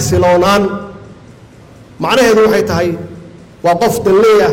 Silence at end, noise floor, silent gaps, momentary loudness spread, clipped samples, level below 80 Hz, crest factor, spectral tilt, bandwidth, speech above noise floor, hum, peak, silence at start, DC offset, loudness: 0 s; -38 dBFS; none; 16 LU; under 0.1%; -40 dBFS; 10 dB; -5 dB/octave; 17 kHz; 28 dB; none; -2 dBFS; 0 s; under 0.1%; -11 LUFS